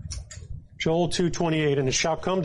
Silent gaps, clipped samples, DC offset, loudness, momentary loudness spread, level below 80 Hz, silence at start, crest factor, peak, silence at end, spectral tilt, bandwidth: none; under 0.1%; under 0.1%; -24 LUFS; 17 LU; -44 dBFS; 0 s; 12 dB; -14 dBFS; 0 s; -4.5 dB/octave; 11.5 kHz